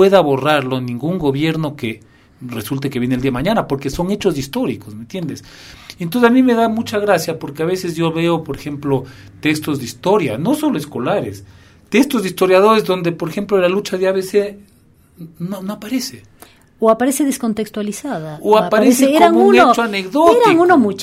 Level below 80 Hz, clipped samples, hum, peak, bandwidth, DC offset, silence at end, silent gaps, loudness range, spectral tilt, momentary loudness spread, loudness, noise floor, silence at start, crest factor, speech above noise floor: -46 dBFS; under 0.1%; none; 0 dBFS; 16 kHz; under 0.1%; 0 s; none; 7 LU; -5.5 dB/octave; 15 LU; -16 LUFS; -50 dBFS; 0 s; 16 dB; 34 dB